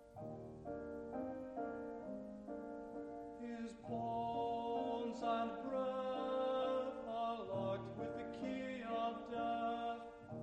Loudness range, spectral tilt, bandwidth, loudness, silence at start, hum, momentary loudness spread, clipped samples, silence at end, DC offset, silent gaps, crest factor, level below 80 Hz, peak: 7 LU; -7 dB/octave; 9.2 kHz; -44 LUFS; 0 s; none; 10 LU; under 0.1%; 0 s; under 0.1%; none; 16 dB; -70 dBFS; -28 dBFS